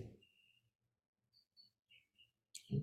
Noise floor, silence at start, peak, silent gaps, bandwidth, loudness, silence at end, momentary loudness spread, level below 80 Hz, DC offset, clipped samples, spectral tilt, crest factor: -76 dBFS; 0 s; -28 dBFS; 0.75-0.79 s, 1.08-1.13 s; 14.5 kHz; -50 LUFS; 0 s; 17 LU; -74 dBFS; under 0.1%; under 0.1%; -6.5 dB/octave; 24 dB